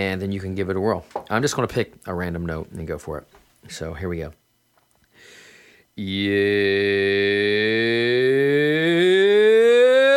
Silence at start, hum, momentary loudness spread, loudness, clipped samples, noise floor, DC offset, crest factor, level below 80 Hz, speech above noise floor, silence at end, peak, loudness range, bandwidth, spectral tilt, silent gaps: 0 s; none; 17 LU; -20 LUFS; under 0.1%; -64 dBFS; under 0.1%; 14 dB; -50 dBFS; 41 dB; 0 s; -6 dBFS; 16 LU; 15 kHz; -5 dB/octave; none